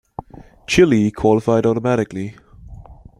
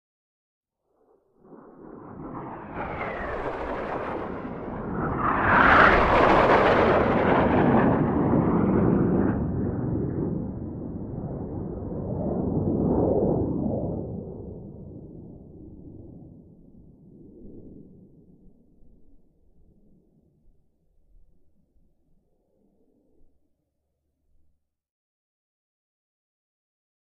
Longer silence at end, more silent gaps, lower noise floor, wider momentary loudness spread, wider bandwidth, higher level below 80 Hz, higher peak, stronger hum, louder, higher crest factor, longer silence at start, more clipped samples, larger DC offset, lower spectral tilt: second, 0.25 s vs 7.95 s; neither; second, -40 dBFS vs -77 dBFS; second, 21 LU vs 24 LU; first, 12.5 kHz vs 8.2 kHz; about the same, -44 dBFS vs -42 dBFS; about the same, -2 dBFS vs -4 dBFS; neither; first, -16 LUFS vs -23 LUFS; second, 16 dB vs 24 dB; second, 0.7 s vs 1.5 s; neither; neither; second, -6 dB/octave vs -8.5 dB/octave